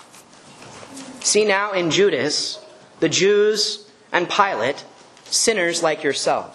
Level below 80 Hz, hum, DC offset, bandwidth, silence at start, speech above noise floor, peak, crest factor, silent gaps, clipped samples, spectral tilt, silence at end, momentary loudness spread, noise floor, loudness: -66 dBFS; none; under 0.1%; 12.5 kHz; 0.15 s; 27 dB; 0 dBFS; 20 dB; none; under 0.1%; -2 dB/octave; 0.05 s; 17 LU; -46 dBFS; -19 LUFS